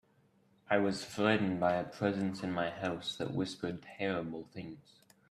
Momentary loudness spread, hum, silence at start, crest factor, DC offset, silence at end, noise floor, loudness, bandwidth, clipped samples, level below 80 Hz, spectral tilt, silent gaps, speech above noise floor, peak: 13 LU; none; 0.7 s; 22 dB; under 0.1%; 0.5 s; -69 dBFS; -35 LUFS; 13.5 kHz; under 0.1%; -70 dBFS; -6 dB/octave; none; 35 dB; -14 dBFS